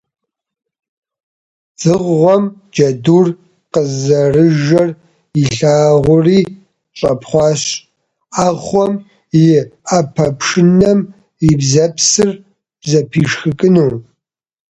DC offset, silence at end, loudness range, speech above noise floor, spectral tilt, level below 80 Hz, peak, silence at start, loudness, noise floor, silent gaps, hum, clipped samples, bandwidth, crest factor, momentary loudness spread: under 0.1%; 0.8 s; 3 LU; 61 dB; -5.5 dB/octave; -44 dBFS; 0 dBFS; 1.8 s; -12 LUFS; -72 dBFS; none; none; under 0.1%; 9.2 kHz; 14 dB; 9 LU